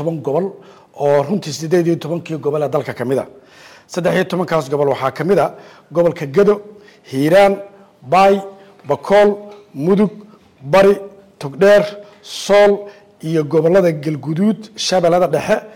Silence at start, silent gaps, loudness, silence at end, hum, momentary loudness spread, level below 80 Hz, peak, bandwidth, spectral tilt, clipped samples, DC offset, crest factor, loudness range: 0 s; none; -16 LUFS; 0.05 s; none; 14 LU; -52 dBFS; -4 dBFS; 16.5 kHz; -6 dB/octave; under 0.1%; under 0.1%; 12 dB; 4 LU